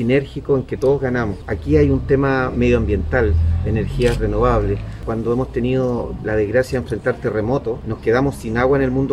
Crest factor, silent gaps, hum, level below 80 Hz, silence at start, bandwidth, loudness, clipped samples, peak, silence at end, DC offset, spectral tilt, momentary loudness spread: 14 dB; none; none; -28 dBFS; 0 s; 13 kHz; -19 LUFS; under 0.1%; -2 dBFS; 0 s; under 0.1%; -8 dB/octave; 6 LU